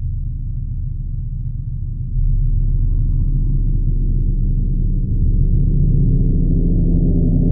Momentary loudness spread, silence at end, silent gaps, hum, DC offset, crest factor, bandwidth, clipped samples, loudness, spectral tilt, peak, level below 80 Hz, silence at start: 9 LU; 0 s; none; none; under 0.1%; 12 dB; 0.8 kHz; under 0.1%; -20 LUFS; -16.5 dB/octave; -4 dBFS; -16 dBFS; 0 s